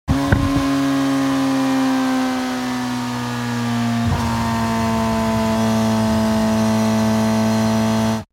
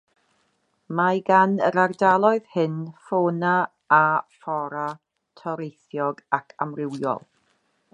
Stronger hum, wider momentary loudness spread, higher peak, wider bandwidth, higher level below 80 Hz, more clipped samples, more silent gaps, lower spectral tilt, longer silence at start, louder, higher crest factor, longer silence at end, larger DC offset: neither; second, 5 LU vs 14 LU; about the same, -2 dBFS vs -4 dBFS; first, 17 kHz vs 9.8 kHz; first, -36 dBFS vs -72 dBFS; neither; neither; second, -5.5 dB/octave vs -7.5 dB/octave; second, 0.05 s vs 0.9 s; first, -18 LUFS vs -23 LUFS; about the same, 16 dB vs 20 dB; second, 0.1 s vs 0.75 s; neither